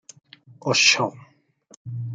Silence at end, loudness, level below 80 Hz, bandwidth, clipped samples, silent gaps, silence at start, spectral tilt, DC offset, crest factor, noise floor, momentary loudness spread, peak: 0 s; -19 LUFS; -72 dBFS; 11 kHz; under 0.1%; 1.77-1.85 s; 0.65 s; -2 dB/octave; under 0.1%; 22 dB; -55 dBFS; 18 LU; -2 dBFS